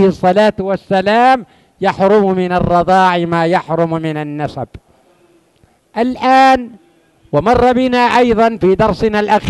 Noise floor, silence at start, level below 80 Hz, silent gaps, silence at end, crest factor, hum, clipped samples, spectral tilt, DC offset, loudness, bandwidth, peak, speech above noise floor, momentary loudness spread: -53 dBFS; 0 s; -38 dBFS; none; 0 s; 12 dB; none; under 0.1%; -6.5 dB/octave; under 0.1%; -12 LUFS; 12 kHz; 0 dBFS; 41 dB; 10 LU